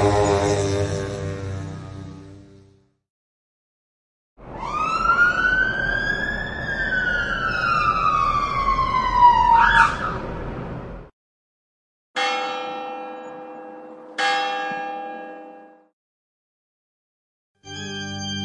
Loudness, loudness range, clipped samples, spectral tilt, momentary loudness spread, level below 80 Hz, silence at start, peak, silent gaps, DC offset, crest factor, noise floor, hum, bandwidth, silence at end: -20 LUFS; 17 LU; under 0.1%; -4.5 dB/octave; 22 LU; -40 dBFS; 0 s; -2 dBFS; 3.10-4.36 s, 11.13-12.14 s, 15.93-17.55 s; under 0.1%; 22 dB; -55 dBFS; none; 11.5 kHz; 0 s